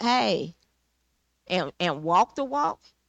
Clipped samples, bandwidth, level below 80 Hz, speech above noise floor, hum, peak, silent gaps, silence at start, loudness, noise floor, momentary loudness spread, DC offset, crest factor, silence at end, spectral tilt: under 0.1%; 8.8 kHz; -66 dBFS; 47 dB; none; -12 dBFS; none; 0 s; -26 LUFS; -73 dBFS; 7 LU; under 0.1%; 16 dB; 0.35 s; -4.5 dB/octave